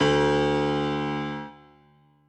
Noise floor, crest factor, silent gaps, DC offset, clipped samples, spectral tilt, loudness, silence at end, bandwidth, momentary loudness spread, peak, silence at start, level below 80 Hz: -59 dBFS; 16 dB; none; under 0.1%; under 0.1%; -6 dB/octave; -25 LUFS; 0.75 s; 9.4 kHz; 14 LU; -10 dBFS; 0 s; -48 dBFS